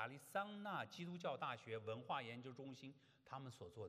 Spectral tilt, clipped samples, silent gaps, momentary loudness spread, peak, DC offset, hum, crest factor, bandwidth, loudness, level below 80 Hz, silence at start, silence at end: -5.5 dB/octave; under 0.1%; none; 10 LU; -30 dBFS; under 0.1%; none; 20 dB; 13.5 kHz; -50 LUFS; under -90 dBFS; 0 s; 0 s